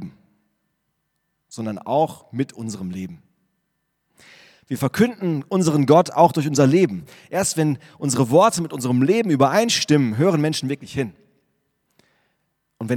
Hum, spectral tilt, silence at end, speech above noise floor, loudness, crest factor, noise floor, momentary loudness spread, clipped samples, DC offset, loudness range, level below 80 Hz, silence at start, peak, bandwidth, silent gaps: none; -5.5 dB/octave; 0 s; 54 dB; -20 LUFS; 20 dB; -73 dBFS; 15 LU; under 0.1%; under 0.1%; 10 LU; -60 dBFS; 0 s; 0 dBFS; 17.5 kHz; none